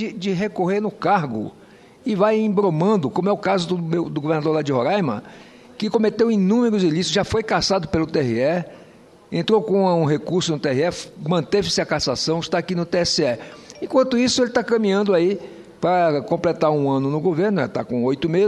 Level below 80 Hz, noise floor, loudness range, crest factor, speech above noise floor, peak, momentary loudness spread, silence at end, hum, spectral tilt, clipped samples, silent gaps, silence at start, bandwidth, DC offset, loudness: -50 dBFS; -47 dBFS; 2 LU; 16 dB; 28 dB; -4 dBFS; 8 LU; 0 s; none; -5.5 dB/octave; under 0.1%; none; 0 s; 11.5 kHz; under 0.1%; -20 LUFS